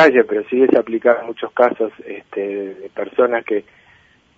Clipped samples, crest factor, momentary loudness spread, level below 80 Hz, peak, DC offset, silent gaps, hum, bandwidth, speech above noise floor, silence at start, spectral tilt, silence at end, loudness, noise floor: under 0.1%; 18 dB; 13 LU; -66 dBFS; 0 dBFS; under 0.1%; none; none; 7.6 kHz; 35 dB; 0 s; -6.5 dB/octave; 0.75 s; -18 LUFS; -52 dBFS